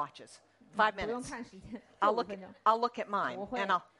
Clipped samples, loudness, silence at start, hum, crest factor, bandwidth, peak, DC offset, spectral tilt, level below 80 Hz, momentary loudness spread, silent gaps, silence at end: under 0.1%; -33 LUFS; 0 s; none; 20 dB; 11.5 kHz; -14 dBFS; under 0.1%; -4 dB/octave; -64 dBFS; 16 LU; none; 0.15 s